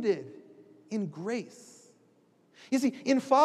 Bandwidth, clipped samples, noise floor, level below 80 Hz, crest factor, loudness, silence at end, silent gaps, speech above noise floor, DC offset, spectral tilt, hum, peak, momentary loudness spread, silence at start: 13 kHz; under 0.1%; -65 dBFS; -90 dBFS; 20 dB; -31 LUFS; 0 s; none; 37 dB; under 0.1%; -5.5 dB/octave; none; -12 dBFS; 23 LU; 0 s